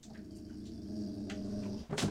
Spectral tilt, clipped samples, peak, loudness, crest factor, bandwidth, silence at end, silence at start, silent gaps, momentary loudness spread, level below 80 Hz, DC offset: -5 dB/octave; under 0.1%; -20 dBFS; -42 LUFS; 20 dB; 16.5 kHz; 0 s; 0 s; none; 9 LU; -58 dBFS; under 0.1%